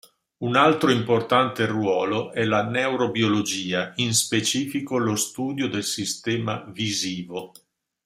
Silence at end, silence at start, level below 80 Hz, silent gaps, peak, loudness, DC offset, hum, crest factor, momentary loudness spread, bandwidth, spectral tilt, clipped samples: 0.6 s; 0.4 s; -64 dBFS; none; -4 dBFS; -23 LUFS; under 0.1%; none; 20 dB; 7 LU; 16 kHz; -4 dB/octave; under 0.1%